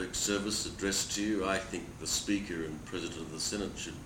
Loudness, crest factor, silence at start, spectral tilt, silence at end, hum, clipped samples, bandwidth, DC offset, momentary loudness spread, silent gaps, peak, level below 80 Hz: -34 LUFS; 20 dB; 0 s; -2.5 dB/octave; 0 s; none; under 0.1%; 17 kHz; under 0.1%; 8 LU; none; -16 dBFS; -54 dBFS